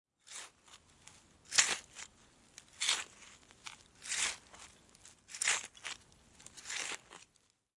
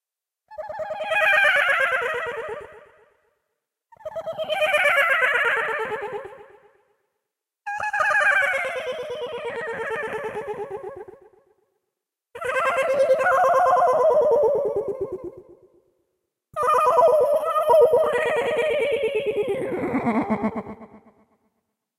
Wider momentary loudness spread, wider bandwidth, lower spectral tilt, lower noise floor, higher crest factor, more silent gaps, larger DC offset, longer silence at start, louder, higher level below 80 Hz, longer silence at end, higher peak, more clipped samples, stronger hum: first, 25 LU vs 17 LU; second, 11.5 kHz vs 15 kHz; second, 2 dB/octave vs -4 dB/octave; second, -74 dBFS vs -83 dBFS; first, 32 dB vs 16 dB; neither; neither; second, 0.25 s vs 0.5 s; second, -35 LUFS vs -21 LUFS; second, -76 dBFS vs -62 dBFS; second, 0.55 s vs 1 s; about the same, -8 dBFS vs -6 dBFS; neither; neither